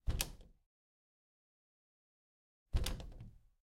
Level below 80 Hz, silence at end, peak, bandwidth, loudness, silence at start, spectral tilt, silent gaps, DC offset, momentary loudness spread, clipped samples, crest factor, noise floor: -46 dBFS; 0.25 s; -18 dBFS; 16 kHz; -43 LUFS; 0.05 s; -3.5 dB/octave; 0.66-2.66 s; under 0.1%; 18 LU; under 0.1%; 28 dB; under -90 dBFS